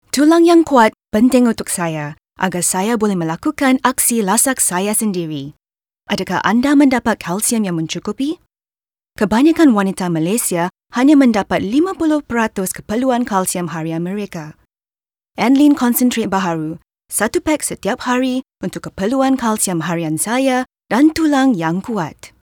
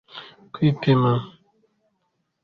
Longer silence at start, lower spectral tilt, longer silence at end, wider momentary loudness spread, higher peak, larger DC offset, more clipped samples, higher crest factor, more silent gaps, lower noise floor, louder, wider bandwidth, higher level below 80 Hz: about the same, 0.15 s vs 0.15 s; second, -4.5 dB/octave vs -9.5 dB/octave; second, 0.15 s vs 1.15 s; second, 11 LU vs 22 LU; first, 0 dBFS vs -6 dBFS; neither; neither; about the same, 16 dB vs 18 dB; neither; first, under -90 dBFS vs -73 dBFS; first, -15 LUFS vs -21 LUFS; first, over 20 kHz vs 5.6 kHz; first, -50 dBFS vs -58 dBFS